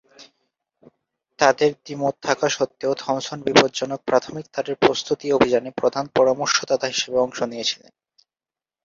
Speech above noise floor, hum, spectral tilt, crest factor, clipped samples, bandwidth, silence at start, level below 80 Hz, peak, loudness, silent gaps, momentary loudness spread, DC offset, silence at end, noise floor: over 69 dB; none; -3.5 dB/octave; 22 dB; under 0.1%; 7.6 kHz; 0.2 s; -60 dBFS; 0 dBFS; -21 LUFS; none; 8 LU; under 0.1%; 1.1 s; under -90 dBFS